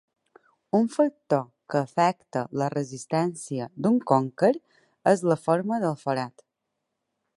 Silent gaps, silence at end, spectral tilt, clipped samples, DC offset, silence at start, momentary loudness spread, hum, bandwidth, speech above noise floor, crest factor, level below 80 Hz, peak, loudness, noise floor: none; 1.05 s; -6.5 dB/octave; under 0.1%; under 0.1%; 0.75 s; 9 LU; none; 11.5 kHz; 57 dB; 20 dB; -72 dBFS; -6 dBFS; -26 LUFS; -81 dBFS